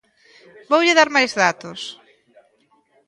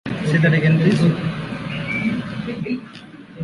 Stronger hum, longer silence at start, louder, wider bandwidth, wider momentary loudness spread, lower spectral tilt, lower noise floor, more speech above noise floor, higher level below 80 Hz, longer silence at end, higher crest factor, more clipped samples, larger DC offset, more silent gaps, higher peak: neither; first, 0.7 s vs 0.05 s; first, -16 LUFS vs -20 LUFS; about the same, 11.5 kHz vs 11 kHz; first, 18 LU vs 14 LU; second, -2.5 dB/octave vs -7.5 dB/octave; first, -61 dBFS vs -39 dBFS; first, 43 dB vs 23 dB; second, -70 dBFS vs -48 dBFS; first, 1.15 s vs 0 s; about the same, 20 dB vs 16 dB; neither; neither; neither; first, 0 dBFS vs -4 dBFS